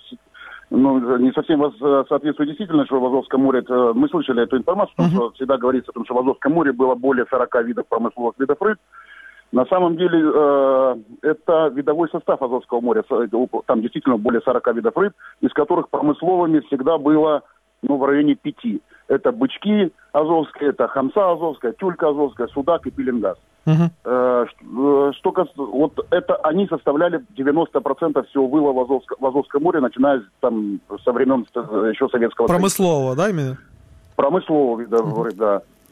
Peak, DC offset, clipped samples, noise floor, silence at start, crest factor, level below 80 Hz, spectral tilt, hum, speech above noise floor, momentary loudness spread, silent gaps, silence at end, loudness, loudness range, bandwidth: -4 dBFS; under 0.1%; under 0.1%; -41 dBFS; 0.1 s; 16 dB; -56 dBFS; -7 dB/octave; none; 23 dB; 7 LU; none; 0.3 s; -19 LUFS; 2 LU; 15 kHz